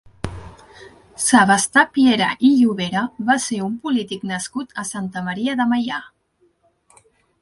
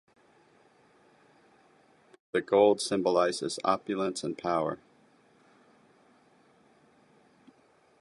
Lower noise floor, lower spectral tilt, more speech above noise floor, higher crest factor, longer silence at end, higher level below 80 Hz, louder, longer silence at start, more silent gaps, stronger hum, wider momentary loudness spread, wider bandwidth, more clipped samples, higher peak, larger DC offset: about the same, -62 dBFS vs -64 dBFS; about the same, -3.5 dB/octave vs -4.5 dB/octave; first, 44 dB vs 37 dB; about the same, 20 dB vs 22 dB; second, 1.35 s vs 3.25 s; first, -50 dBFS vs -72 dBFS; first, -18 LUFS vs -28 LUFS; second, 0.25 s vs 2.35 s; neither; neither; first, 13 LU vs 10 LU; about the same, 11.5 kHz vs 11.5 kHz; neither; first, 0 dBFS vs -10 dBFS; neither